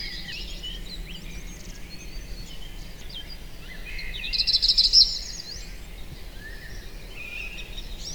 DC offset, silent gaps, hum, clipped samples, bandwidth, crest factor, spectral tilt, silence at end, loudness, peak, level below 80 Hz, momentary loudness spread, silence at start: 0.5%; none; none; under 0.1%; over 20 kHz; 26 dB; -1 dB/octave; 0 s; -22 LUFS; -4 dBFS; -38 dBFS; 24 LU; 0 s